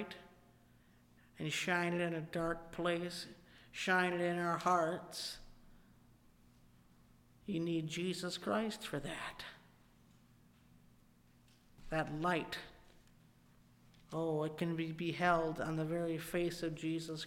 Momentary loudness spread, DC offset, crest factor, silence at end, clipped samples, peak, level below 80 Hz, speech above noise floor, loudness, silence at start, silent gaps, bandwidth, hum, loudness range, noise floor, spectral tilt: 14 LU; under 0.1%; 22 dB; 0 s; under 0.1%; -20 dBFS; -64 dBFS; 29 dB; -38 LUFS; 0 s; none; 16.5 kHz; none; 7 LU; -67 dBFS; -5 dB/octave